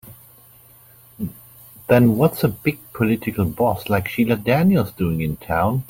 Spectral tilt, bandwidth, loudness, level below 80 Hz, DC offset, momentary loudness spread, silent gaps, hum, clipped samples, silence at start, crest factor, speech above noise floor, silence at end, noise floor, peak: -7.5 dB/octave; 17 kHz; -19 LUFS; -46 dBFS; under 0.1%; 14 LU; none; none; under 0.1%; 0.05 s; 18 dB; 30 dB; 0.05 s; -49 dBFS; -2 dBFS